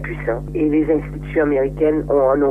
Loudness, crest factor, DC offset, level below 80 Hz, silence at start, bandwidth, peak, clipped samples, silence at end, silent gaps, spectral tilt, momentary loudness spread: -18 LUFS; 12 dB; under 0.1%; -34 dBFS; 0 s; 3.7 kHz; -4 dBFS; under 0.1%; 0 s; none; -9.5 dB/octave; 7 LU